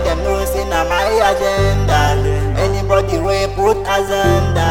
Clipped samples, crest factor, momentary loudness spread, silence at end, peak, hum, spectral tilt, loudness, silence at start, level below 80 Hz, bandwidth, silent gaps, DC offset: under 0.1%; 14 dB; 4 LU; 0 s; 0 dBFS; none; -5.5 dB/octave; -15 LUFS; 0 s; -24 dBFS; 16.5 kHz; none; under 0.1%